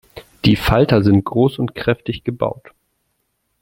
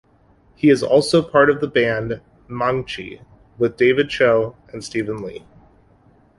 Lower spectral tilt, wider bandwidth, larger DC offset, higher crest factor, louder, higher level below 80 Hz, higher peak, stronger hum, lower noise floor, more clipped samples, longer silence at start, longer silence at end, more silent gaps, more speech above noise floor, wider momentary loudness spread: first, -7.5 dB/octave vs -5.5 dB/octave; first, 16.5 kHz vs 11.5 kHz; neither; about the same, 16 dB vs 18 dB; about the same, -17 LUFS vs -18 LUFS; first, -36 dBFS vs -52 dBFS; about the same, -2 dBFS vs -2 dBFS; neither; first, -69 dBFS vs -54 dBFS; neither; second, 0.15 s vs 0.65 s; about the same, 1.1 s vs 1 s; neither; first, 53 dB vs 36 dB; second, 10 LU vs 16 LU